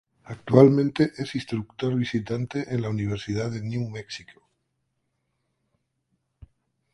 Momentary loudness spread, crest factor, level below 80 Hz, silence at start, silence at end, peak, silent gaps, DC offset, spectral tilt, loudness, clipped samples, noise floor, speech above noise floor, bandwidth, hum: 19 LU; 24 dB; -56 dBFS; 0.3 s; 2.7 s; -2 dBFS; none; under 0.1%; -7.5 dB/octave; -24 LUFS; under 0.1%; -76 dBFS; 52 dB; 11 kHz; none